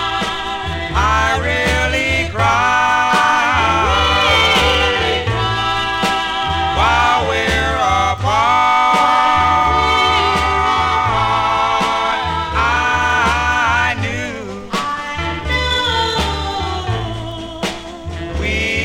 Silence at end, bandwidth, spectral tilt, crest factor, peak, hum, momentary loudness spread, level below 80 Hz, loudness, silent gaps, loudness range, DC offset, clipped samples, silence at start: 0 s; 16.5 kHz; -4 dB/octave; 16 dB; 0 dBFS; none; 9 LU; -28 dBFS; -15 LUFS; none; 6 LU; under 0.1%; under 0.1%; 0 s